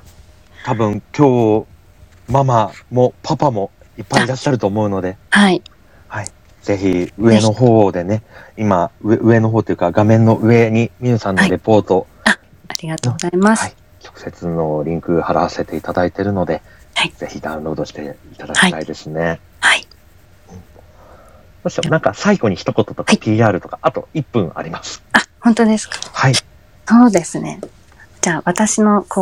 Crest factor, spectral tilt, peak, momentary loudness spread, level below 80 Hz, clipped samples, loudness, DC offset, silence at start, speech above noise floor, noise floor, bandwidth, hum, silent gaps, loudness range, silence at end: 16 dB; -5.5 dB/octave; 0 dBFS; 14 LU; -46 dBFS; under 0.1%; -15 LUFS; 0.3%; 0.6 s; 32 dB; -47 dBFS; 16 kHz; none; none; 6 LU; 0 s